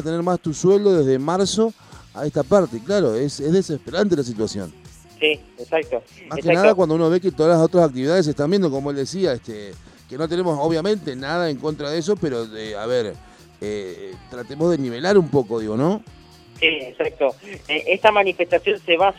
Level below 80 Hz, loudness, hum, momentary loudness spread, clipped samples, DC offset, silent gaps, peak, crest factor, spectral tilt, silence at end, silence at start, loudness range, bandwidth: -52 dBFS; -20 LUFS; none; 14 LU; under 0.1%; under 0.1%; none; 0 dBFS; 20 dB; -5.5 dB/octave; 0 s; 0 s; 5 LU; 12 kHz